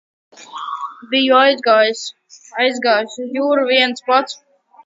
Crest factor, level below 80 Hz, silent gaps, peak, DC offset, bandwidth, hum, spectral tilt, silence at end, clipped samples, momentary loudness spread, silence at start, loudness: 18 dB; -72 dBFS; none; 0 dBFS; under 0.1%; 7.8 kHz; none; -2 dB/octave; 0.5 s; under 0.1%; 17 LU; 0.4 s; -15 LUFS